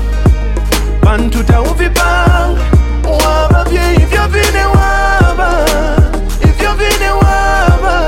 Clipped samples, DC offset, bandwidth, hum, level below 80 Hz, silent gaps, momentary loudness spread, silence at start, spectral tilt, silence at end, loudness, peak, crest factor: under 0.1%; under 0.1%; 16.5 kHz; none; -12 dBFS; none; 3 LU; 0 s; -5.5 dB/octave; 0 s; -11 LUFS; 0 dBFS; 10 dB